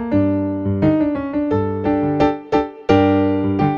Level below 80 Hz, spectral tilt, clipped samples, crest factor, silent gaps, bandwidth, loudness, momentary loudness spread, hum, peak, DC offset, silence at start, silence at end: -42 dBFS; -9 dB/octave; under 0.1%; 16 dB; none; 6.6 kHz; -18 LUFS; 5 LU; none; -2 dBFS; under 0.1%; 0 s; 0 s